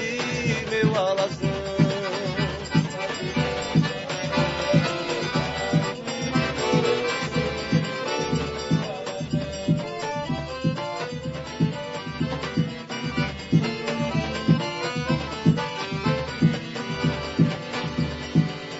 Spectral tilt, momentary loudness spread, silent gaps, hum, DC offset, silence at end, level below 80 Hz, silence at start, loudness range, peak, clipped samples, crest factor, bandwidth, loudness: -6 dB/octave; 7 LU; none; none; under 0.1%; 0 s; -46 dBFS; 0 s; 4 LU; -6 dBFS; under 0.1%; 20 dB; 8 kHz; -25 LUFS